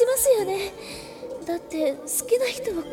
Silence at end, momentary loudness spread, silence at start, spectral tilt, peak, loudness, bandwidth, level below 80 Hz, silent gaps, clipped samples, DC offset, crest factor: 0 s; 17 LU; 0 s; -2.5 dB/octave; -8 dBFS; -25 LUFS; 17.5 kHz; -56 dBFS; none; under 0.1%; under 0.1%; 16 dB